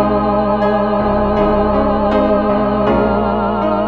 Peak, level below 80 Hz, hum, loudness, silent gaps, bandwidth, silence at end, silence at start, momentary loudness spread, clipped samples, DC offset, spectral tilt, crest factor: -2 dBFS; -28 dBFS; none; -14 LUFS; none; 5.4 kHz; 0 s; 0 s; 2 LU; under 0.1%; 0.9%; -9.5 dB/octave; 12 dB